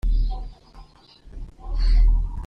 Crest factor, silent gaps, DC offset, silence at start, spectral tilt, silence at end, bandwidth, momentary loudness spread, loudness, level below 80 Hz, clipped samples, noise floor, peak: 12 dB; none; under 0.1%; 0.05 s; -7 dB/octave; 0 s; 5.2 kHz; 21 LU; -25 LUFS; -22 dBFS; under 0.1%; -48 dBFS; -10 dBFS